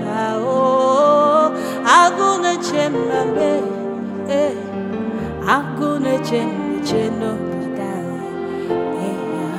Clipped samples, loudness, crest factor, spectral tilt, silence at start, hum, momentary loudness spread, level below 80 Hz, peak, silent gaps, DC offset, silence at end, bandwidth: under 0.1%; -18 LUFS; 18 dB; -5 dB/octave; 0 s; none; 12 LU; -52 dBFS; 0 dBFS; none; under 0.1%; 0 s; 15.5 kHz